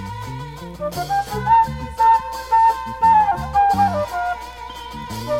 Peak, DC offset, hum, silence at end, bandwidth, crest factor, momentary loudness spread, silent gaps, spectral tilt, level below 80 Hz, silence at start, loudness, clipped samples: -6 dBFS; under 0.1%; none; 0 s; 16.5 kHz; 14 dB; 16 LU; none; -5 dB/octave; -40 dBFS; 0 s; -18 LUFS; under 0.1%